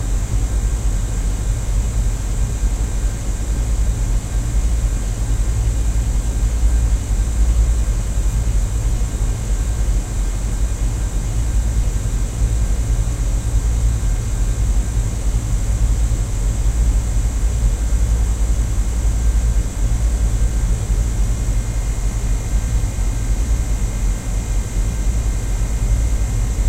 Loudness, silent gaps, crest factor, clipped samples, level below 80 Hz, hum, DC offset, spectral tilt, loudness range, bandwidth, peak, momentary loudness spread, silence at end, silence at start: -21 LUFS; none; 12 dB; under 0.1%; -18 dBFS; none; under 0.1%; -5.5 dB/octave; 2 LU; 14 kHz; -4 dBFS; 3 LU; 0 s; 0 s